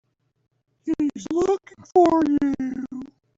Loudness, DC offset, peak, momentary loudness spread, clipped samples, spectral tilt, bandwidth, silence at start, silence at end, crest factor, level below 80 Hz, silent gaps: -22 LUFS; under 0.1%; -6 dBFS; 16 LU; under 0.1%; -6.5 dB/octave; 7.8 kHz; 0.85 s; 0.3 s; 18 dB; -56 dBFS; none